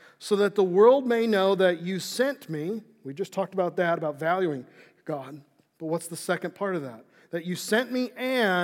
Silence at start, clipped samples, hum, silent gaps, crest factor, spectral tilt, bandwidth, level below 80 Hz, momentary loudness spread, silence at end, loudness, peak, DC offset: 0.2 s; under 0.1%; none; none; 18 dB; -5 dB/octave; 17 kHz; under -90 dBFS; 15 LU; 0 s; -26 LUFS; -8 dBFS; under 0.1%